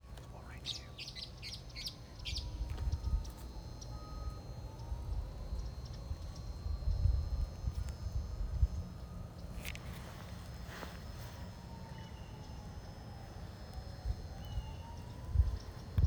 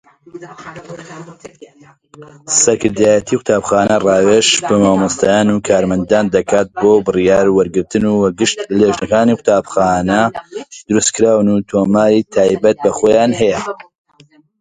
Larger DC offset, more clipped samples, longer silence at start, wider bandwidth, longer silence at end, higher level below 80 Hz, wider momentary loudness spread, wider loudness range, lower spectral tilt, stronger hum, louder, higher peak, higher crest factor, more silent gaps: neither; neither; second, 0.05 s vs 0.35 s; first, over 20 kHz vs 9.6 kHz; second, 0 s vs 0.8 s; about the same, -42 dBFS vs -44 dBFS; second, 12 LU vs 17 LU; first, 8 LU vs 3 LU; first, -5.5 dB/octave vs -4 dB/octave; neither; second, -43 LUFS vs -13 LUFS; second, -18 dBFS vs 0 dBFS; first, 22 dB vs 14 dB; neither